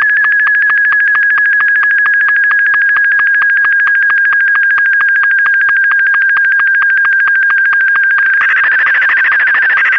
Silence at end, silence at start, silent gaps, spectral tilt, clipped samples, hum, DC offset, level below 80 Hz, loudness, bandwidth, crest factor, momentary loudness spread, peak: 0 s; 0 s; none; -1 dB/octave; under 0.1%; none; 0.2%; -60 dBFS; -8 LUFS; 6 kHz; 4 dB; 0 LU; -4 dBFS